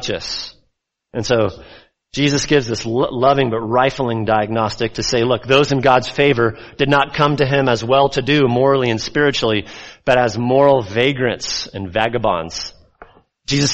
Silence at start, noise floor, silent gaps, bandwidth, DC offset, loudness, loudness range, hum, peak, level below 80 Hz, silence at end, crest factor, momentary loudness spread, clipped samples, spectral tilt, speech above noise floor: 0 s; -68 dBFS; none; 8.4 kHz; under 0.1%; -16 LUFS; 3 LU; none; 0 dBFS; -44 dBFS; 0 s; 16 dB; 9 LU; under 0.1%; -5 dB/octave; 52 dB